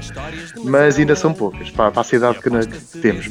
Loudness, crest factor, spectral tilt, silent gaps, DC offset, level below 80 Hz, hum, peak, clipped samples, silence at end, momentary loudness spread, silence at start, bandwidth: -17 LUFS; 16 dB; -6 dB/octave; none; under 0.1%; -40 dBFS; none; 0 dBFS; under 0.1%; 0 s; 14 LU; 0 s; 11 kHz